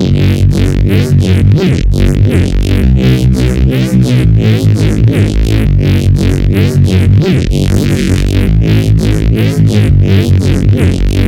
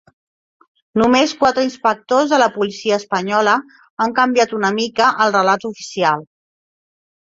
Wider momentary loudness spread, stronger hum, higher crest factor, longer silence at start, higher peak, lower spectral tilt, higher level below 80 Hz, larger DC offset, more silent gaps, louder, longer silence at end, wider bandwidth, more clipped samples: second, 2 LU vs 7 LU; neither; second, 8 dB vs 16 dB; second, 0 s vs 0.95 s; about the same, 0 dBFS vs -2 dBFS; first, -7.5 dB/octave vs -4 dB/octave; first, -16 dBFS vs -58 dBFS; neither; second, none vs 3.90-3.97 s; first, -9 LUFS vs -16 LUFS; second, 0 s vs 1 s; first, 15.5 kHz vs 7.8 kHz; neither